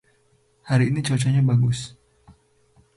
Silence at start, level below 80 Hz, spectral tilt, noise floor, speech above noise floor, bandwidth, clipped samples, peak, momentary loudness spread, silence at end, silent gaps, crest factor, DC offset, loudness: 0.65 s; -54 dBFS; -6.5 dB/octave; -62 dBFS; 42 dB; 11.5 kHz; under 0.1%; -8 dBFS; 9 LU; 1.1 s; none; 14 dB; under 0.1%; -21 LUFS